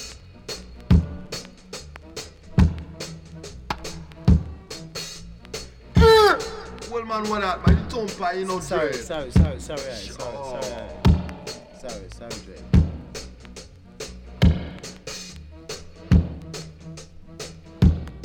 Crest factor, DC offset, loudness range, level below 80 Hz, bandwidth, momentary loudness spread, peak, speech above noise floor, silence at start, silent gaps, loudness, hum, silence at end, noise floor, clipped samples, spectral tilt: 18 dB; under 0.1%; 8 LU; -30 dBFS; 16 kHz; 18 LU; -4 dBFS; 18 dB; 0 s; none; -23 LUFS; none; 0 s; -43 dBFS; under 0.1%; -6 dB/octave